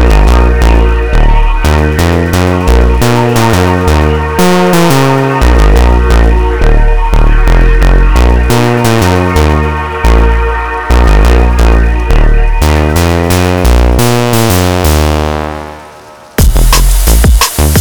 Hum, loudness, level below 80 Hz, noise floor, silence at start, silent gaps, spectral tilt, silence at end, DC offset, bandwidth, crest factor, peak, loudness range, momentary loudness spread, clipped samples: none; -8 LUFS; -8 dBFS; -32 dBFS; 0 s; none; -5.5 dB/octave; 0 s; under 0.1%; over 20 kHz; 6 dB; 0 dBFS; 2 LU; 4 LU; 0.2%